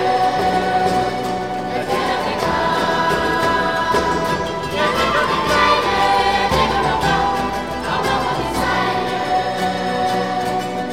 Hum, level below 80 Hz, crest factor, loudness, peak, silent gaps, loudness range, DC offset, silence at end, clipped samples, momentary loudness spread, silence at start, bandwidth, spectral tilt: none; -38 dBFS; 16 dB; -18 LUFS; -2 dBFS; none; 3 LU; 0.6%; 0 s; under 0.1%; 6 LU; 0 s; 16.5 kHz; -4.5 dB/octave